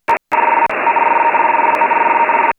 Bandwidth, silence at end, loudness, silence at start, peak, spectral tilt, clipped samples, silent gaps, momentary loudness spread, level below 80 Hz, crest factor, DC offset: 7.2 kHz; 0.05 s; -13 LUFS; 0.1 s; -2 dBFS; -4.5 dB/octave; under 0.1%; none; 2 LU; -58 dBFS; 12 dB; under 0.1%